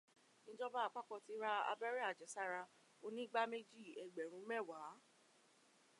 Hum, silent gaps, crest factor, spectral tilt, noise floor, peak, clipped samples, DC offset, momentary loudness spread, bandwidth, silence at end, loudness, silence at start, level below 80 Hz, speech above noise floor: none; none; 22 dB; -2.5 dB/octave; -73 dBFS; -26 dBFS; under 0.1%; under 0.1%; 15 LU; 11.5 kHz; 1 s; -46 LUFS; 0.45 s; under -90 dBFS; 27 dB